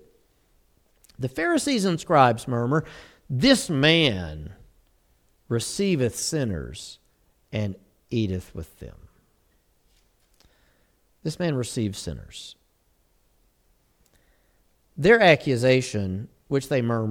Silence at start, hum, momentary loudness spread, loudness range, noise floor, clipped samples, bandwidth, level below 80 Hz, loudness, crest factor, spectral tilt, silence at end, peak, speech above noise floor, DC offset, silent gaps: 1.2 s; none; 22 LU; 14 LU; -66 dBFS; under 0.1%; 17.5 kHz; -50 dBFS; -23 LUFS; 24 dB; -5 dB/octave; 0 s; -2 dBFS; 43 dB; under 0.1%; none